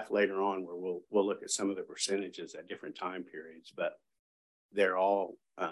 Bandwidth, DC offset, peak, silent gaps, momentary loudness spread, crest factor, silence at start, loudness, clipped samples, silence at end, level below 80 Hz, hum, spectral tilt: 12.5 kHz; under 0.1%; -16 dBFS; 4.19-4.69 s; 14 LU; 18 dB; 0 s; -34 LUFS; under 0.1%; 0 s; -82 dBFS; none; -3 dB/octave